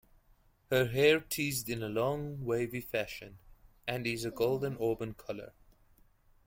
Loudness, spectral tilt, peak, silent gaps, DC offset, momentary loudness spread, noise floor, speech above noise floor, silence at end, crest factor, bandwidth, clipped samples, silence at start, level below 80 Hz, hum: -33 LUFS; -4.5 dB/octave; -14 dBFS; none; under 0.1%; 16 LU; -66 dBFS; 34 dB; 0.95 s; 20 dB; 16.5 kHz; under 0.1%; 0.7 s; -60 dBFS; none